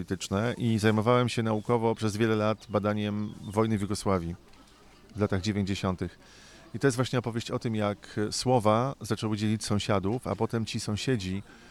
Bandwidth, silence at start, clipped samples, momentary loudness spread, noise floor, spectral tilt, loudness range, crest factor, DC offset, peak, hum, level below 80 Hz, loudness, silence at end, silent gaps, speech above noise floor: 13.5 kHz; 0 s; under 0.1%; 8 LU; -55 dBFS; -6 dB/octave; 4 LU; 20 dB; under 0.1%; -8 dBFS; none; -56 dBFS; -29 LUFS; 0 s; none; 26 dB